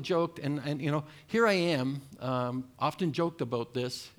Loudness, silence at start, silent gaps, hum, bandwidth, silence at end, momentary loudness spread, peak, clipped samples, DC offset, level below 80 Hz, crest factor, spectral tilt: -31 LUFS; 0 s; none; none; 20 kHz; 0.1 s; 9 LU; -14 dBFS; under 0.1%; under 0.1%; -70 dBFS; 18 dB; -6 dB/octave